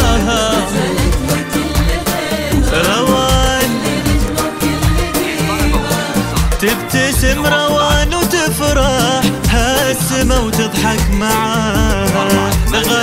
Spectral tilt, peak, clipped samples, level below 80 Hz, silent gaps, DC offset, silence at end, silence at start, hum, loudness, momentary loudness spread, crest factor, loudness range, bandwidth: -4 dB/octave; 0 dBFS; under 0.1%; -20 dBFS; none; under 0.1%; 0 s; 0 s; none; -14 LUFS; 4 LU; 14 dB; 2 LU; 16.5 kHz